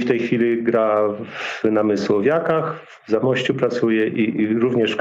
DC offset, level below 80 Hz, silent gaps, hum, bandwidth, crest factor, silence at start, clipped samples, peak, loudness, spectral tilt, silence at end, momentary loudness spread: under 0.1%; -62 dBFS; none; none; 7.8 kHz; 14 dB; 0 s; under 0.1%; -6 dBFS; -19 LUFS; -6.5 dB/octave; 0 s; 6 LU